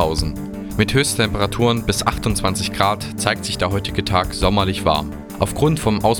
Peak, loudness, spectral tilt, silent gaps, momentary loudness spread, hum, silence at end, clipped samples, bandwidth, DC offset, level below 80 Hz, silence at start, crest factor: 0 dBFS; -19 LUFS; -4.5 dB/octave; none; 6 LU; none; 0 s; under 0.1%; 19 kHz; under 0.1%; -32 dBFS; 0 s; 18 dB